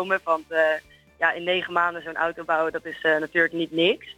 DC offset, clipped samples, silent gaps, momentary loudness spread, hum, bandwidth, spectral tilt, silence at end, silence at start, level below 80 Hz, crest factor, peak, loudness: under 0.1%; under 0.1%; none; 5 LU; none; 14 kHz; -5 dB/octave; 0.05 s; 0 s; -64 dBFS; 18 dB; -6 dBFS; -24 LUFS